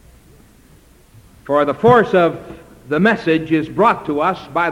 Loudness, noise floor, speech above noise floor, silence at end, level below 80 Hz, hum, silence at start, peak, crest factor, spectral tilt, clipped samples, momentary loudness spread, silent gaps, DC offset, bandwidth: -16 LUFS; -48 dBFS; 32 dB; 0 s; -48 dBFS; none; 1.45 s; -2 dBFS; 16 dB; -7.5 dB/octave; under 0.1%; 7 LU; none; under 0.1%; 13.5 kHz